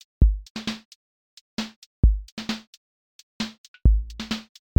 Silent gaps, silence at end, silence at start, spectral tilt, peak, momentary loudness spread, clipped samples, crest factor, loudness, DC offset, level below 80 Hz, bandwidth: 0.50-0.55 s, 0.85-1.57 s, 1.76-2.03 s, 2.32-2.37 s, 2.67-3.40 s, 3.58-3.74 s; 0.35 s; 0.2 s; -6 dB/octave; -6 dBFS; 11 LU; under 0.1%; 20 dB; -27 LUFS; under 0.1%; -26 dBFS; 8.8 kHz